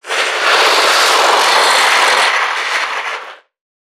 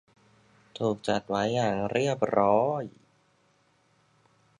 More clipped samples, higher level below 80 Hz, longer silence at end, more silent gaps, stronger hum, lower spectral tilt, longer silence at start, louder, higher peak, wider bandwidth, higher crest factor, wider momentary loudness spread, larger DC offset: neither; second, -74 dBFS vs -64 dBFS; second, 0.5 s vs 1.7 s; neither; neither; second, 2 dB/octave vs -6 dB/octave; second, 0.05 s vs 0.75 s; first, -10 LUFS vs -27 LUFS; first, 0 dBFS vs -8 dBFS; first, 19.5 kHz vs 11 kHz; second, 12 dB vs 22 dB; about the same, 9 LU vs 10 LU; neither